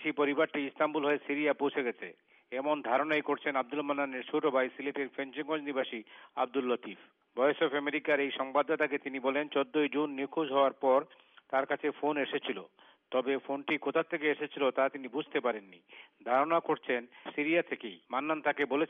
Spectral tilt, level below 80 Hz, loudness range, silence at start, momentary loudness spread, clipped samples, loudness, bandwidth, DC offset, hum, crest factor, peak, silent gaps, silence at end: -2 dB/octave; -86 dBFS; 3 LU; 0 s; 9 LU; under 0.1%; -32 LUFS; 4.6 kHz; under 0.1%; none; 16 dB; -16 dBFS; none; 0.05 s